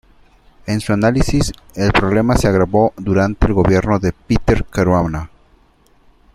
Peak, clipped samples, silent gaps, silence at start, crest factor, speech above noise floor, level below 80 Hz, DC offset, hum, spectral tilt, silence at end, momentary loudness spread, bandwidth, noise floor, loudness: -2 dBFS; under 0.1%; none; 0.65 s; 14 dB; 38 dB; -28 dBFS; under 0.1%; none; -6.5 dB/octave; 1.1 s; 8 LU; 14.5 kHz; -52 dBFS; -16 LUFS